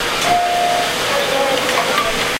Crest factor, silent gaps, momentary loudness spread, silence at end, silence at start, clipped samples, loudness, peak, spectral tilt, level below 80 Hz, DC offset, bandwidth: 14 dB; none; 1 LU; 0 s; 0 s; under 0.1%; -16 LUFS; -2 dBFS; -2 dB/octave; -42 dBFS; under 0.1%; 16.5 kHz